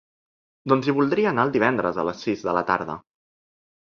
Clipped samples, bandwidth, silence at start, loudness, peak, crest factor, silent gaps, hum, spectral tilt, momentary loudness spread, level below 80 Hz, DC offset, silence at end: under 0.1%; 7 kHz; 0.65 s; -22 LUFS; -2 dBFS; 22 dB; none; none; -7 dB/octave; 9 LU; -60 dBFS; under 0.1%; 1 s